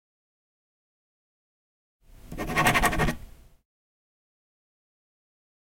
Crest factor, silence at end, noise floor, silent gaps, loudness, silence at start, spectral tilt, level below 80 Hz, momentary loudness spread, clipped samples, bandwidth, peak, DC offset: 26 dB; 2.4 s; -45 dBFS; none; -24 LUFS; 2.25 s; -4 dB/octave; -42 dBFS; 18 LU; under 0.1%; 16.5 kHz; -6 dBFS; under 0.1%